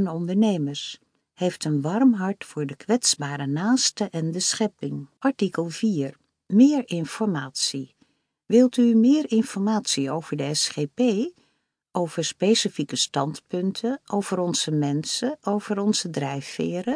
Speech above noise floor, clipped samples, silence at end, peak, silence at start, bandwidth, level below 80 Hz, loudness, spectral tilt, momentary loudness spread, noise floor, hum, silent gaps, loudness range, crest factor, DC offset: 48 dB; under 0.1%; 0 s; -6 dBFS; 0 s; 10.5 kHz; -74 dBFS; -24 LUFS; -4.5 dB/octave; 10 LU; -71 dBFS; none; none; 4 LU; 18 dB; under 0.1%